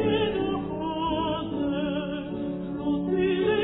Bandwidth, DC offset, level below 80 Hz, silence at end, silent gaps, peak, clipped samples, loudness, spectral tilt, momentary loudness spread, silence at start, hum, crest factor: 4.1 kHz; under 0.1%; -48 dBFS; 0 s; none; -14 dBFS; under 0.1%; -28 LUFS; -10.5 dB/octave; 7 LU; 0 s; none; 14 dB